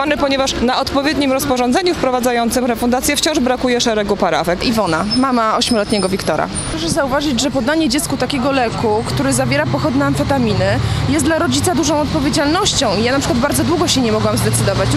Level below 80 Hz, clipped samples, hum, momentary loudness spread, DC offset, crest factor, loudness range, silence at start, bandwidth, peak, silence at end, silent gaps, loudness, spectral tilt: -34 dBFS; under 0.1%; none; 3 LU; under 0.1%; 14 dB; 1 LU; 0 s; 16 kHz; 0 dBFS; 0 s; none; -15 LUFS; -4.5 dB/octave